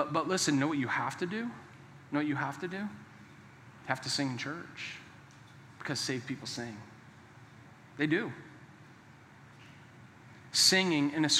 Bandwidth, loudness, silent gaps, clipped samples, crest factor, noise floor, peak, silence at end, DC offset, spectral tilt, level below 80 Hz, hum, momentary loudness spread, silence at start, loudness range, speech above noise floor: 16 kHz; -32 LUFS; none; under 0.1%; 24 dB; -56 dBFS; -12 dBFS; 0 s; under 0.1%; -3 dB/octave; -78 dBFS; none; 26 LU; 0 s; 8 LU; 24 dB